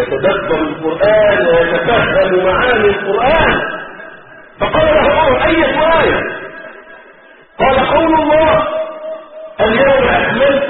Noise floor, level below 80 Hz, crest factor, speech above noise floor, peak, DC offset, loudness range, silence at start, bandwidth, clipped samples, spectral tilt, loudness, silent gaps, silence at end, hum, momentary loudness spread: -41 dBFS; -32 dBFS; 12 dB; 30 dB; 0 dBFS; under 0.1%; 3 LU; 0 s; 4.3 kHz; under 0.1%; -3 dB/octave; -12 LUFS; none; 0 s; none; 16 LU